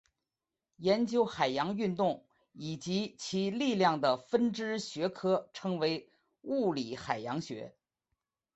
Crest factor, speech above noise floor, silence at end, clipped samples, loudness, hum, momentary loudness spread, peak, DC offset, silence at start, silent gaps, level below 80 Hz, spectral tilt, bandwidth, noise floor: 20 dB; over 58 dB; 0.85 s; under 0.1%; -33 LUFS; none; 12 LU; -14 dBFS; under 0.1%; 0.8 s; none; -72 dBFS; -5.5 dB/octave; 8.2 kHz; under -90 dBFS